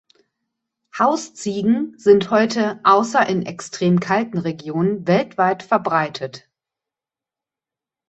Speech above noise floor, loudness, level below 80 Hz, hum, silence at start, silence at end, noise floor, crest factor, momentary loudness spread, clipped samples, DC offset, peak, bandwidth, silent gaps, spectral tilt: 71 dB; -19 LUFS; -62 dBFS; none; 0.95 s; 1.7 s; -89 dBFS; 18 dB; 10 LU; under 0.1%; under 0.1%; -2 dBFS; 8.4 kHz; none; -6 dB/octave